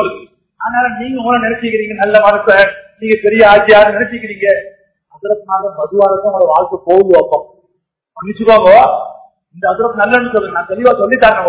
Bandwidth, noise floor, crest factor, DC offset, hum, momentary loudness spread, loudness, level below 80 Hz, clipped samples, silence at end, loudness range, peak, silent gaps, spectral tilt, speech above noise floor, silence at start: 4 kHz; -67 dBFS; 10 dB; under 0.1%; none; 12 LU; -10 LUFS; -46 dBFS; 2%; 0 s; 3 LU; 0 dBFS; none; -8.5 dB/octave; 57 dB; 0 s